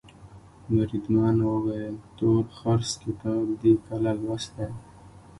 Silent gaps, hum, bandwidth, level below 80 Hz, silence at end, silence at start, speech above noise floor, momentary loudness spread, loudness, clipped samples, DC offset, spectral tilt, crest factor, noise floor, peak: none; none; 11.5 kHz; -50 dBFS; 0.2 s; 0.05 s; 24 dB; 11 LU; -26 LUFS; under 0.1%; under 0.1%; -7 dB/octave; 18 dB; -49 dBFS; -8 dBFS